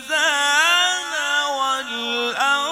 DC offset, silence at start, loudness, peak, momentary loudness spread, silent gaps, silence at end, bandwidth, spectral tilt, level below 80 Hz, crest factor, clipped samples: under 0.1%; 0 s; -18 LUFS; -6 dBFS; 7 LU; none; 0 s; 17 kHz; 1.5 dB/octave; -68 dBFS; 14 dB; under 0.1%